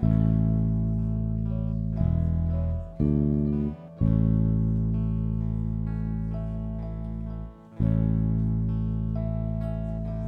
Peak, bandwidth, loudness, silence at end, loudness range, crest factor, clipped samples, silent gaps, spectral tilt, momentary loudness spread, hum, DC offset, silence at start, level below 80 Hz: -12 dBFS; 3.2 kHz; -27 LUFS; 0 s; 4 LU; 14 dB; under 0.1%; none; -12.5 dB/octave; 9 LU; none; under 0.1%; 0 s; -32 dBFS